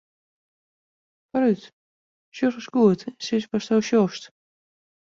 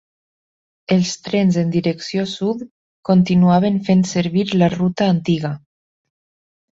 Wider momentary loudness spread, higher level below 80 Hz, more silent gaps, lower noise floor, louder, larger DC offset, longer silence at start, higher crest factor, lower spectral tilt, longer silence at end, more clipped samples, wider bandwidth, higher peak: second, 10 LU vs 13 LU; second, -68 dBFS vs -54 dBFS; first, 1.73-2.32 s vs 2.71-3.03 s; about the same, under -90 dBFS vs under -90 dBFS; second, -23 LUFS vs -17 LUFS; neither; first, 1.35 s vs 0.9 s; about the same, 20 dB vs 16 dB; about the same, -6 dB/octave vs -6.5 dB/octave; second, 0.9 s vs 1.2 s; neither; about the same, 7.6 kHz vs 7.8 kHz; about the same, -6 dBFS vs -4 dBFS